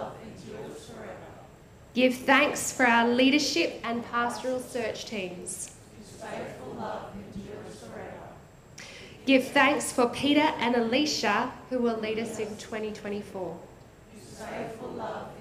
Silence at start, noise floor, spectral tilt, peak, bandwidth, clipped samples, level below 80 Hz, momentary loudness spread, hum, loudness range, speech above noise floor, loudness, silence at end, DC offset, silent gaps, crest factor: 0 s; -51 dBFS; -3 dB/octave; -8 dBFS; 15.5 kHz; under 0.1%; -60 dBFS; 21 LU; none; 13 LU; 24 dB; -27 LUFS; 0 s; under 0.1%; none; 22 dB